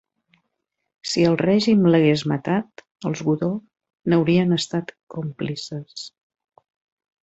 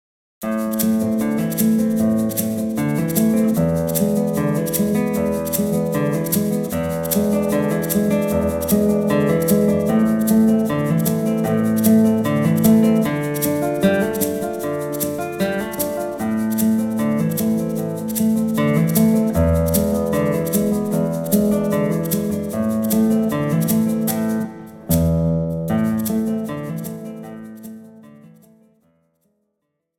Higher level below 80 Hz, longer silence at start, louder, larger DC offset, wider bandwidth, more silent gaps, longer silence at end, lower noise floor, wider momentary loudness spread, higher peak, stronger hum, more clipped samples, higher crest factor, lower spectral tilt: second, -60 dBFS vs -44 dBFS; first, 1.05 s vs 0.4 s; about the same, -21 LUFS vs -19 LUFS; neither; second, 8.2 kHz vs 18 kHz; first, 5.03-5.07 s vs none; second, 1.15 s vs 1.7 s; about the same, -78 dBFS vs -75 dBFS; first, 17 LU vs 7 LU; second, -6 dBFS vs -2 dBFS; neither; neither; about the same, 18 dB vs 16 dB; about the same, -6.5 dB/octave vs -6.5 dB/octave